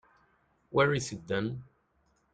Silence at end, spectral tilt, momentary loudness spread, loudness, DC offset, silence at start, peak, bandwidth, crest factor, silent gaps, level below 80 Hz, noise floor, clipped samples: 0.7 s; -5 dB/octave; 10 LU; -31 LUFS; under 0.1%; 0.7 s; -12 dBFS; 9.4 kHz; 22 dB; none; -62 dBFS; -72 dBFS; under 0.1%